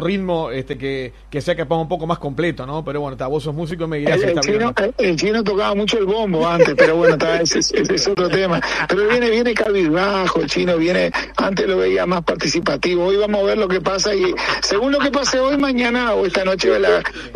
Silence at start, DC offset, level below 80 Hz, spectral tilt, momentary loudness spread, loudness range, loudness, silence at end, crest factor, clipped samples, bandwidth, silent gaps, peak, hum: 0 s; under 0.1%; -42 dBFS; -4.5 dB/octave; 8 LU; 5 LU; -17 LUFS; 0 s; 18 dB; under 0.1%; 11 kHz; none; 0 dBFS; none